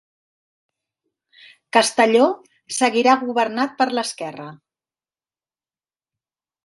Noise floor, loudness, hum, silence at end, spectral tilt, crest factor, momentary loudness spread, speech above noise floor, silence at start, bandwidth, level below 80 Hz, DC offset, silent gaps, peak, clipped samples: under -90 dBFS; -18 LUFS; none; 2.1 s; -2.5 dB/octave; 22 dB; 16 LU; over 71 dB; 1.75 s; 11.5 kHz; -74 dBFS; under 0.1%; none; 0 dBFS; under 0.1%